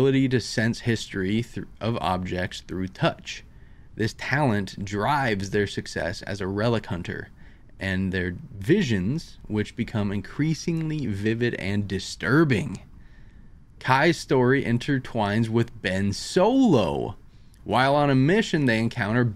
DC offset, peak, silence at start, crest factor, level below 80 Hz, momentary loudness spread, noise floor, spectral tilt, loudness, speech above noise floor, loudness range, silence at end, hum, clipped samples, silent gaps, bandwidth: under 0.1%; -2 dBFS; 0 s; 22 dB; -48 dBFS; 12 LU; -47 dBFS; -6 dB/octave; -25 LUFS; 23 dB; 5 LU; 0 s; none; under 0.1%; none; 14 kHz